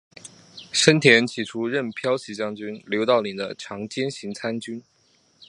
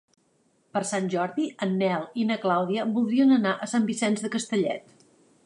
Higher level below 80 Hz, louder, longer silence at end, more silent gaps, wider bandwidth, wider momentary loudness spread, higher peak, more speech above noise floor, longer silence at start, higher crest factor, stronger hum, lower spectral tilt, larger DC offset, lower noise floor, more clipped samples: first, -68 dBFS vs -78 dBFS; first, -22 LUFS vs -26 LUFS; second, 0.05 s vs 0.65 s; neither; about the same, 11.5 kHz vs 11 kHz; first, 18 LU vs 8 LU; first, 0 dBFS vs -10 dBFS; about the same, 39 dB vs 42 dB; second, 0.25 s vs 0.75 s; first, 24 dB vs 16 dB; neither; about the same, -4 dB/octave vs -5 dB/octave; neither; second, -62 dBFS vs -67 dBFS; neither